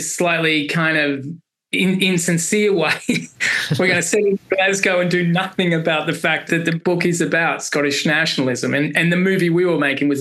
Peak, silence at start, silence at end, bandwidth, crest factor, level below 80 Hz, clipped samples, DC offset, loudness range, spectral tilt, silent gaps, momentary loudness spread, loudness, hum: -2 dBFS; 0 s; 0 s; 13 kHz; 16 dB; -64 dBFS; under 0.1%; under 0.1%; 1 LU; -4.5 dB/octave; none; 3 LU; -17 LUFS; none